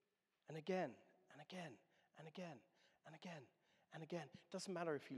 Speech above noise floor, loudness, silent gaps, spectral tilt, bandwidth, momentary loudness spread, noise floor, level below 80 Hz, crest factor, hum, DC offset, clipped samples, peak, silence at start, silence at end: 20 dB; -52 LUFS; none; -5.5 dB/octave; 12.5 kHz; 21 LU; -70 dBFS; under -90 dBFS; 22 dB; none; under 0.1%; under 0.1%; -30 dBFS; 0.5 s; 0 s